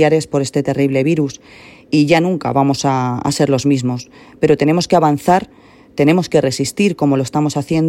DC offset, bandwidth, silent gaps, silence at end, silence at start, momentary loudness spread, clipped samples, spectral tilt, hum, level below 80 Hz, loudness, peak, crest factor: under 0.1%; 16 kHz; none; 0 s; 0 s; 6 LU; under 0.1%; -6 dB/octave; none; -50 dBFS; -15 LUFS; 0 dBFS; 14 dB